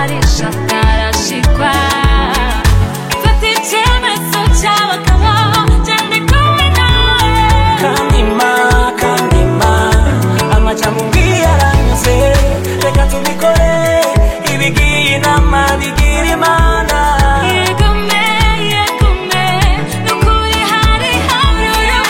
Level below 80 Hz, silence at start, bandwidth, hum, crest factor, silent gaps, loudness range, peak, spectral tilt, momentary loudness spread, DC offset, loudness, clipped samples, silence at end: -14 dBFS; 0 s; 17 kHz; none; 10 dB; none; 2 LU; 0 dBFS; -4.5 dB/octave; 3 LU; under 0.1%; -11 LUFS; under 0.1%; 0 s